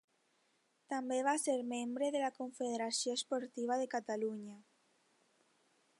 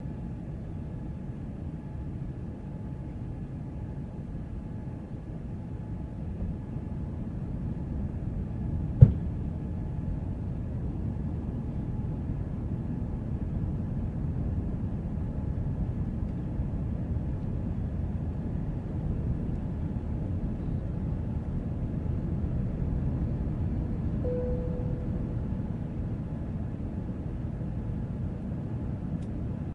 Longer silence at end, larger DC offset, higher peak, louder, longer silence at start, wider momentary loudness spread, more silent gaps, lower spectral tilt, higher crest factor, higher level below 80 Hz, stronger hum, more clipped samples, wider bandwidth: first, 1.4 s vs 0 s; neither; second, -20 dBFS vs 0 dBFS; second, -38 LUFS vs -33 LUFS; first, 0.9 s vs 0 s; about the same, 7 LU vs 7 LU; neither; second, -2.5 dB/octave vs -11 dB/octave; second, 18 dB vs 30 dB; second, under -90 dBFS vs -38 dBFS; neither; neither; first, 11.5 kHz vs 4.6 kHz